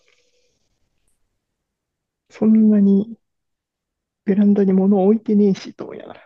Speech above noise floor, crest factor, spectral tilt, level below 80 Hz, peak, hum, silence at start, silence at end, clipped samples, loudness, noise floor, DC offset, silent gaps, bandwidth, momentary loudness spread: 66 dB; 14 dB; -9.5 dB/octave; -68 dBFS; -4 dBFS; none; 2.4 s; 0.15 s; under 0.1%; -16 LUFS; -81 dBFS; under 0.1%; none; 6.4 kHz; 18 LU